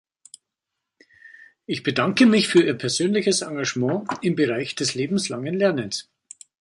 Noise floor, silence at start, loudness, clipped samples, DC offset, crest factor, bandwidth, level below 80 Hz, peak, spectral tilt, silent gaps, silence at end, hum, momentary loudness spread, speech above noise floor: -83 dBFS; 1.7 s; -22 LUFS; under 0.1%; under 0.1%; 20 dB; 11.5 kHz; -66 dBFS; -4 dBFS; -4.5 dB/octave; none; 0.6 s; none; 10 LU; 62 dB